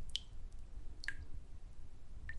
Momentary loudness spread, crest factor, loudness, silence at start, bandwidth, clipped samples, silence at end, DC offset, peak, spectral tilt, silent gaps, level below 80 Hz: 13 LU; 24 dB; -51 LUFS; 0 s; 11 kHz; under 0.1%; 0 s; under 0.1%; -20 dBFS; -2.5 dB/octave; none; -50 dBFS